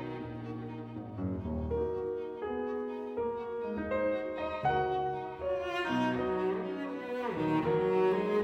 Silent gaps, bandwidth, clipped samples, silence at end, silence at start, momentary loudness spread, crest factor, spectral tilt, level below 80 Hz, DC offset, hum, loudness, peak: none; 8.4 kHz; under 0.1%; 0 s; 0 s; 11 LU; 14 dB; -7.5 dB/octave; -56 dBFS; under 0.1%; none; -34 LUFS; -18 dBFS